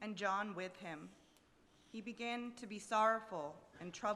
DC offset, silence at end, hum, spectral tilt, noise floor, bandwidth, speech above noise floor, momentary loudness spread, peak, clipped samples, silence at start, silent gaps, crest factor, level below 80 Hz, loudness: under 0.1%; 0 s; none; -4 dB/octave; -70 dBFS; 13 kHz; 28 dB; 17 LU; -22 dBFS; under 0.1%; 0 s; none; 22 dB; -80 dBFS; -41 LUFS